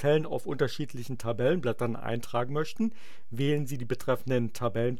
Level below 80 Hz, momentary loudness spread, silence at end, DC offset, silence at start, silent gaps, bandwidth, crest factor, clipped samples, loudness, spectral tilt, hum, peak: -62 dBFS; 7 LU; 0 s; 2%; 0 s; none; 16.5 kHz; 16 dB; under 0.1%; -31 LUFS; -6.5 dB/octave; none; -14 dBFS